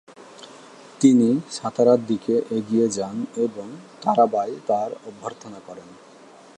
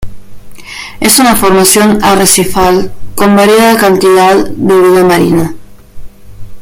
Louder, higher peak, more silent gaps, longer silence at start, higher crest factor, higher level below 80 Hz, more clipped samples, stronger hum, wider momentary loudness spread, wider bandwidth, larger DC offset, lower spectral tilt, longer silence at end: second, -21 LUFS vs -6 LUFS; second, -4 dBFS vs 0 dBFS; neither; about the same, 0.1 s vs 0 s; first, 20 dB vs 8 dB; second, -70 dBFS vs -32 dBFS; second, under 0.1% vs 0.5%; neither; first, 23 LU vs 8 LU; second, 10.5 kHz vs over 20 kHz; neither; first, -6 dB/octave vs -4 dB/octave; first, 0.65 s vs 0 s